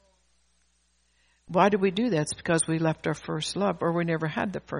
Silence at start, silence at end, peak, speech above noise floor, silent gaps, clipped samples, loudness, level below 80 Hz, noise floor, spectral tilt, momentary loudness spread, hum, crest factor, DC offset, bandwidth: 1.5 s; 0 s; -6 dBFS; 43 dB; none; under 0.1%; -26 LUFS; -60 dBFS; -69 dBFS; -5 dB/octave; 8 LU; none; 20 dB; under 0.1%; 10.5 kHz